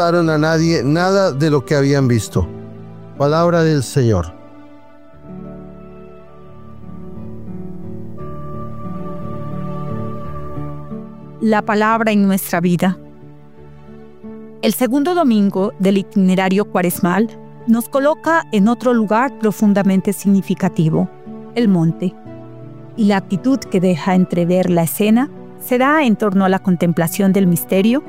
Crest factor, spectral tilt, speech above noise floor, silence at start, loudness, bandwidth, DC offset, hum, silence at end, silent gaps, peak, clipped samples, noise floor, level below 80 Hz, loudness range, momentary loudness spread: 14 dB; -6.5 dB/octave; 29 dB; 0 s; -16 LUFS; 16 kHz; 0.9%; none; 0 s; none; -2 dBFS; under 0.1%; -43 dBFS; -46 dBFS; 14 LU; 19 LU